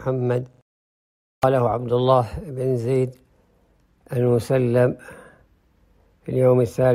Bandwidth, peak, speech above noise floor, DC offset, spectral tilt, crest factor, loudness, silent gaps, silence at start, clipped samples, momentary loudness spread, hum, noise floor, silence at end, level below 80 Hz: 14.5 kHz; -6 dBFS; 40 dB; under 0.1%; -8 dB/octave; 16 dB; -21 LUFS; 0.62-1.42 s; 0 s; under 0.1%; 11 LU; none; -60 dBFS; 0 s; -50 dBFS